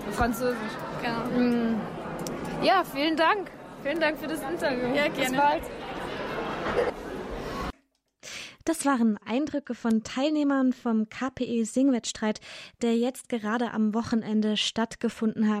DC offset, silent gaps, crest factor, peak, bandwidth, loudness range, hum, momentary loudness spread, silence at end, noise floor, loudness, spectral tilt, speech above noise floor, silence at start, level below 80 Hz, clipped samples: under 0.1%; none; 16 dB; -12 dBFS; 15.5 kHz; 3 LU; none; 11 LU; 0 s; -67 dBFS; -28 LUFS; -4.5 dB/octave; 40 dB; 0 s; -52 dBFS; under 0.1%